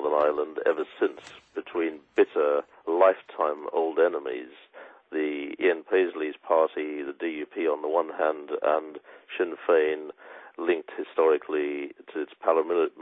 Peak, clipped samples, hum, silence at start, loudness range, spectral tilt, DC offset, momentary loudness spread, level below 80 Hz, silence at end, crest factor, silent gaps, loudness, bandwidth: -6 dBFS; under 0.1%; none; 0 s; 2 LU; -5.5 dB/octave; under 0.1%; 12 LU; -76 dBFS; 0 s; 20 dB; none; -27 LUFS; 4.8 kHz